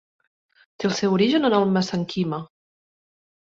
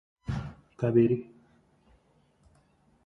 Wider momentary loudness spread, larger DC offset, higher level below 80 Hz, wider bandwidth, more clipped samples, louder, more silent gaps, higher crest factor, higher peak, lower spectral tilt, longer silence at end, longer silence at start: second, 9 LU vs 13 LU; neither; second, -62 dBFS vs -54 dBFS; first, 7.6 kHz vs 6.6 kHz; neither; first, -22 LUFS vs -28 LUFS; neither; about the same, 18 dB vs 20 dB; first, -6 dBFS vs -12 dBFS; second, -6 dB/octave vs -10 dB/octave; second, 0.95 s vs 1.85 s; first, 0.8 s vs 0.3 s